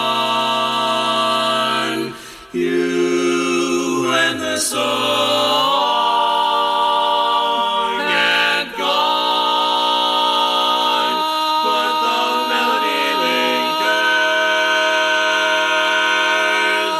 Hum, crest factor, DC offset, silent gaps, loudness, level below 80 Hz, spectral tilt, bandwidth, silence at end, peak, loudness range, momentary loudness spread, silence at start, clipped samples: none; 14 dB; under 0.1%; none; -16 LUFS; -60 dBFS; -2 dB/octave; 14.5 kHz; 0 s; -4 dBFS; 3 LU; 3 LU; 0 s; under 0.1%